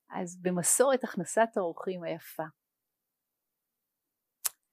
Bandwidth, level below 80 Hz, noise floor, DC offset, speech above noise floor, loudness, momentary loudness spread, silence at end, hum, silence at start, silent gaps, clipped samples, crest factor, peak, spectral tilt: 15.5 kHz; under -90 dBFS; -87 dBFS; under 0.1%; 57 dB; -30 LUFS; 15 LU; 0.2 s; none; 0.1 s; none; under 0.1%; 28 dB; -4 dBFS; -3.5 dB/octave